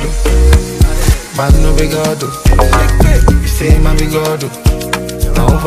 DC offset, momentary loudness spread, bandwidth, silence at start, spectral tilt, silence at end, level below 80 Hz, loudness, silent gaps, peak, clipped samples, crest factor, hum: under 0.1%; 6 LU; 15.5 kHz; 0 s; -5.5 dB/octave; 0 s; -10 dBFS; -12 LUFS; none; 0 dBFS; under 0.1%; 10 dB; none